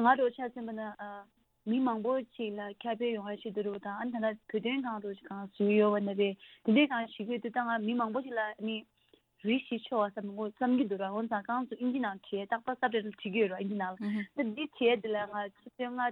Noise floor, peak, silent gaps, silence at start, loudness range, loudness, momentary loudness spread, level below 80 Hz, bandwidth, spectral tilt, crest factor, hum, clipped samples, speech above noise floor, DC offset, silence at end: -67 dBFS; -12 dBFS; none; 0 s; 5 LU; -33 LUFS; 11 LU; -80 dBFS; 4.5 kHz; -8.5 dB/octave; 20 dB; none; under 0.1%; 35 dB; under 0.1%; 0 s